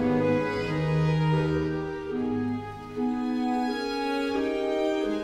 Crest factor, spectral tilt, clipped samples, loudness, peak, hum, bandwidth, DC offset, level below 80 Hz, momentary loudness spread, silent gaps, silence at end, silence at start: 14 dB; -7.5 dB/octave; under 0.1%; -27 LUFS; -14 dBFS; none; 10.5 kHz; under 0.1%; -50 dBFS; 7 LU; none; 0 s; 0 s